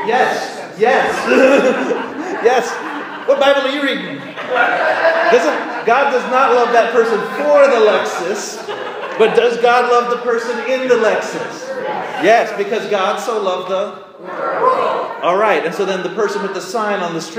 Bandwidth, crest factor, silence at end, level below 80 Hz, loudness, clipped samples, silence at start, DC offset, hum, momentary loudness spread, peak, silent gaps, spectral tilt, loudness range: 15.5 kHz; 14 dB; 0 s; -66 dBFS; -15 LUFS; under 0.1%; 0 s; under 0.1%; none; 12 LU; 0 dBFS; none; -3.5 dB/octave; 4 LU